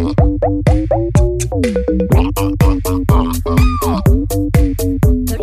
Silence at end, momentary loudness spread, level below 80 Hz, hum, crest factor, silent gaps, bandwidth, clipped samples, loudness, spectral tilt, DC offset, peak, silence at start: 0 s; 3 LU; -18 dBFS; none; 12 dB; none; 15.5 kHz; under 0.1%; -14 LUFS; -7 dB/octave; under 0.1%; 0 dBFS; 0 s